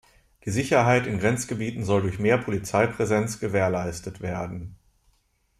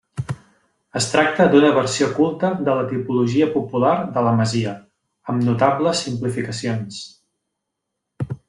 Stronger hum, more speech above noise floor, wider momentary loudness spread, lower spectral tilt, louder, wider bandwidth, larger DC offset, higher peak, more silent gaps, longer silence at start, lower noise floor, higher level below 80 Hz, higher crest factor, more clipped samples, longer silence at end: neither; second, 43 dB vs 61 dB; second, 12 LU vs 16 LU; about the same, -6 dB/octave vs -5.5 dB/octave; second, -25 LUFS vs -19 LUFS; first, 14.5 kHz vs 11.5 kHz; neither; second, -8 dBFS vs 0 dBFS; neither; first, 0.45 s vs 0.15 s; second, -67 dBFS vs -79 dBFS; about the same, -52 dBFS vs -56 dBFS; about the same, 18 dB vs 20 dB; neither; first, 0.85 s vs 0.1 s